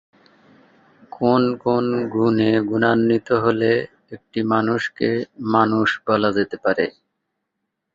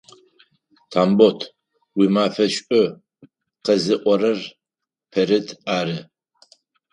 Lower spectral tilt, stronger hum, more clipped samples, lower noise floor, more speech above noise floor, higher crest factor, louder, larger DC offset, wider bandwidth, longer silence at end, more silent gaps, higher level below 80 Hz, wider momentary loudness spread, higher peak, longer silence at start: first, -7.5 dB/octave vs -5.5 dB/octave; neither; neither; second, -78 dBFS vs -86 dBFS; second, 59 dB vs 67 dB; about the same, 18 dB vs 20 dB; about the same, -20 LUFS vs -20 LUFS; neither; second, 7.6 kHz vs 11 kHz; first, 1.05 s vs 0.9 s; neither; first, -58 dBFS vs -66 dBFS; second, 6 LU vs 13 LU; about the same, -2 dBFS vs 0 dBFS; first, 1.2 s vs 0.9 s